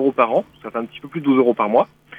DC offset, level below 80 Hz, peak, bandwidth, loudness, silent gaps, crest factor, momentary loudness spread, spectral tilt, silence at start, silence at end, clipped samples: under 0.1%; -64 dBFS; -2 dBFS; 4.5 kHz; -19 LUFS; none; 16 dB; 12 LU; -8.5 dB/octave; 0 s; 0 s; under 0.1%